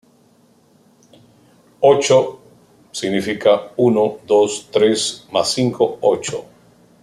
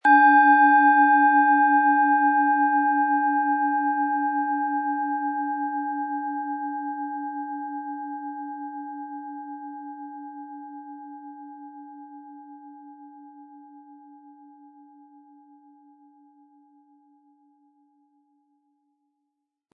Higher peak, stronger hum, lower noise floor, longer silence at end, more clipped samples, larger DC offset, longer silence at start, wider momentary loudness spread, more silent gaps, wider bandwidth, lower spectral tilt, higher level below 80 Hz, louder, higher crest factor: first, -2 dBFS vs -6 dBFS; neither; second, -54 dBFS vs -81 dBFS; second, 0.6 s vs 5.95 s; neither; neither; first, 1.8 s vs 0.05 s; second, 10 LU vs 25 LU; neither; first, 13 kHz vs 4.9 kHz; about the same, -4 dB/octave vs -5 dB/octave; first, -62 dBFS vs under -90 dBFS; first, -17 LUFS vs -21 LUFS; about the same, 16 dB vs 18 dB